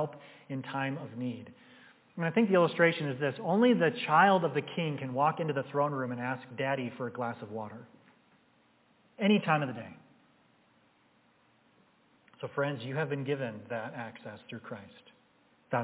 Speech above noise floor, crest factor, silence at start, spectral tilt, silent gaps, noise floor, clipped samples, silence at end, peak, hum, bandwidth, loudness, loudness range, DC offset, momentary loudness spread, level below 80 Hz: 36 dB; 22 dB; 0 s; -4.5 dB/octave; none; -67 dBFS; under 0.1%; 0 s; -10 dBFS; none; 4 kHz; -31 LUFS; 11 LU; under 0.1%; 19 LU; -80 dBFS